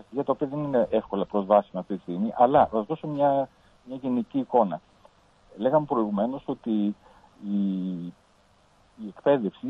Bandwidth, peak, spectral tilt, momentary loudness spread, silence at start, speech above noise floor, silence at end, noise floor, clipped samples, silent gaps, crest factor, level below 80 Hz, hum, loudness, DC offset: 5.6 kHz; -6 dBFS; -9.5 dB/octave; 14 LU; 0.1 s; 36 dB; 0 s; -61 dBFS; under 0.1%; none; 20 dB; -62 dBFS; none; -26 LUFS; under 0.1%